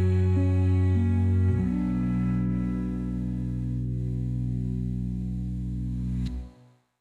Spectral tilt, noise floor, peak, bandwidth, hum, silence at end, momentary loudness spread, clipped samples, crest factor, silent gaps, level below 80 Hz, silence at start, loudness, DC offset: -10 dB/octave; -56 dBFS; -14 dBFS; 4.4 kHz; none; 0.5 s; 8 LU; under 0.1%; 10 dB; none; -38 dBFS; 0 s; -27 LUFS; under 0.1%